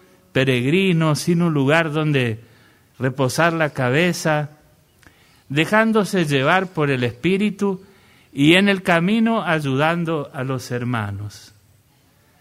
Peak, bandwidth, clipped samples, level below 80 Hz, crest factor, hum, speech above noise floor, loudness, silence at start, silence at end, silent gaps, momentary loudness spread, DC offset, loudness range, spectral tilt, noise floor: -2 dBFS; 15.5 kHz; under 0.1%; -56 dBFS; 18 dB; none; 38 dB; -19 LUFS; 0.35 s; 1 s; none; 9 LU; under 0.1%; 3 LU; -5.5 dB/octave; -57 dBFS